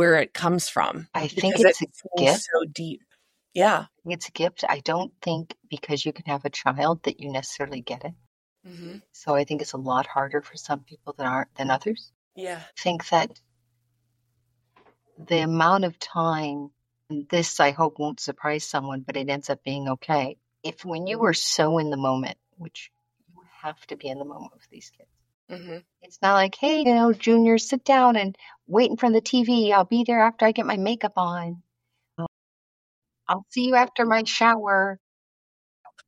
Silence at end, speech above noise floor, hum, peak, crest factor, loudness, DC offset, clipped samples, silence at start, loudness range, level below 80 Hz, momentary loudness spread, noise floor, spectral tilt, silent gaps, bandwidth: 0.2 s; 54 dB; none; -4 dBFS; 22 dB; -23 LUFS; under 0.1%; under 0.1%; 0 s; 9 LU; -72 dBFS; 18 LU; -78 dBFS; -4.5 dB/octave; 8.27-8.56 s, 12.15-12.31 s, 25.34-25.47 s, 32.28-33.02 s, 35.00-35.84 s; 13.5 kHz